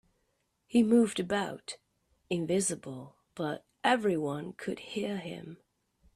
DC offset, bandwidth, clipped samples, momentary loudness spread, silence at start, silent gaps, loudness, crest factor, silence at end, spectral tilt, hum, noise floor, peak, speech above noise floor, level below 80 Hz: under 0.1%; 14 kHz; under 0.1%; 19 LU; 0.7 s; none; -31 LUFS; 20 dB; 0.6 s; -4.5 dB/octave; none; -77 dBFS; -12 dBFS; 47 dB; -70 dBFS